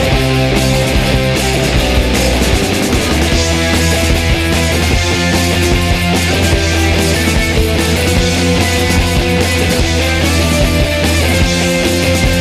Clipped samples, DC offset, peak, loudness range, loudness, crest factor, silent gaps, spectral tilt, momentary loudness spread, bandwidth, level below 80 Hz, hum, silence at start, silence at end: under 0.1%; under 0.1%; 0 dBFS; 0 LU; -12 LUFS; 12 dB; none; -4.5 dB/octave; 1 LU; 15 kHz; -20 dBFS; none; 0 s; 0 s